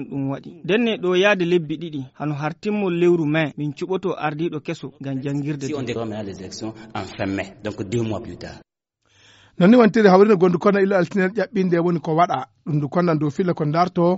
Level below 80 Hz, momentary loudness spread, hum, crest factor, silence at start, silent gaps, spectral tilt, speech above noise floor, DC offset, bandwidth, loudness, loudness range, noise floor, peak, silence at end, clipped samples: -58 dBFS; 17 LU; none; 20 dB; 0 s; none; -6 dB/octave; 44 dB; under 0.1%; 8 kHz; -20 LUFS; 11 LU; -64 dBFS; 0 dBFS; 0 s; under 0.1%